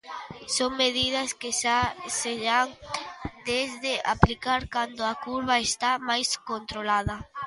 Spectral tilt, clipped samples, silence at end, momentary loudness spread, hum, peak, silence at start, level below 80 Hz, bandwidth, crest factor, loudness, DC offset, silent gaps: -3 dB/octave; under 0.1%; 0 s; 10 LU; none; 0 dBFS; 0.05 s; -44 dBFS; 11.5 kHz; 28 dB; -26 LUFS; under 0.1%; none